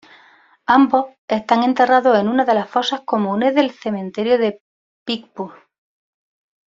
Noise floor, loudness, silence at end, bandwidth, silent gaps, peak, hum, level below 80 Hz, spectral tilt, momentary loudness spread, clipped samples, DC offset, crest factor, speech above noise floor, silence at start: -51 dBFS; -17 LUFS; 1.2 s; 7.6 kHz; 1.18-1.28 s, 4.60-5.06 s; -2 dBFS; none; -64 dBFS; -5.5 dB/octave; 13 LU; under 0.1%; under 0.1%; 16 dB; 35 dB; 0.7 s